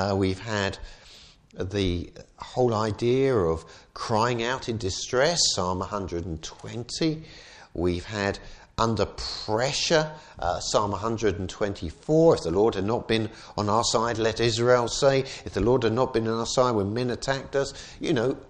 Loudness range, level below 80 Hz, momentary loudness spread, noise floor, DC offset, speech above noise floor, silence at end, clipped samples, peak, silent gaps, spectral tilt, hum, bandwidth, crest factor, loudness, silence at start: 5 LU; -46 dBFS; 13 LU; -51 dBFS; under 0.1%; 25 dB; 0.05 s; under 0.1%; -6 dBFS; none; -4.5 dB/octave; none; 10.5 kHz; 20 dB; -25 LUFS; 0 s